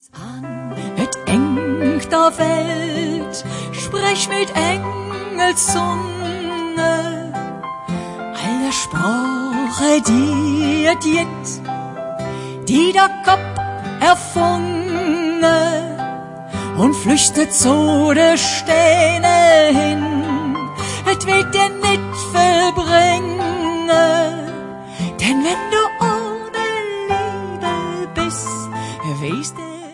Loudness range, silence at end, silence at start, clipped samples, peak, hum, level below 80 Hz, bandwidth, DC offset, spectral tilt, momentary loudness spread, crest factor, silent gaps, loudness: 7 LU; 0 s; 0.15 s; under 0.1%; 0 dBFS; none; -48 dBFS; 11.5 kHz; under 0.1%; -4 dB/octave; 13 LU; 16 dB; none; -17 LUFS